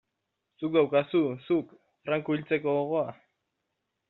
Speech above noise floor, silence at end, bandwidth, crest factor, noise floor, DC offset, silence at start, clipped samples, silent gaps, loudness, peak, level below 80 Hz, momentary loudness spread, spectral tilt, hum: 55 dB; 0.95 s; 4.1 kHz; 18 dB; -82 dBFS; under 0.1%; 0.6 s; under 0.1%; none; -28 LUFS; -12 dBFS; -74 dBFS; 12 LU; -5.5 dB/octave; none